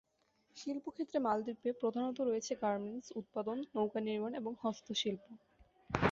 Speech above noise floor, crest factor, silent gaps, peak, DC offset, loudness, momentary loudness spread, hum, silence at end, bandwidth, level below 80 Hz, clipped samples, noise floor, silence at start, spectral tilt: 38 dB; 26 dB; none; -14 dBFS; under 0.1%; -39 LUFS; 8 LU; none; 0 s; 7.6 kHz; -64 dBFS; under 0.1%; -76 dBFS; 0.55 s; -4 dB/octave